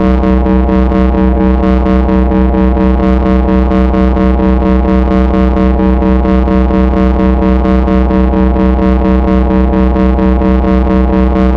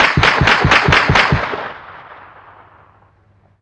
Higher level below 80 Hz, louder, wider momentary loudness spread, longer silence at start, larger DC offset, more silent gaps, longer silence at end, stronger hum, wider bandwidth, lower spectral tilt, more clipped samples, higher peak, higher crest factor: first, -12 dBFS vs -30 dBFS; about the same, -10 LUFS vs -11 LUFS; second, 0 LU vs 16 LU; about the same, 0 s vs 0 s; first, 0.4% vs under 0.1%; neither; second, 0 s vs 1.5 s; neither; second, 5 kHz vs 10 kHz; first, -10 dB/octave vs -4.5 dB/octave; neither; about the same, 0 dBFS vs 0 dBFS; second, 8 dB vs 16 dB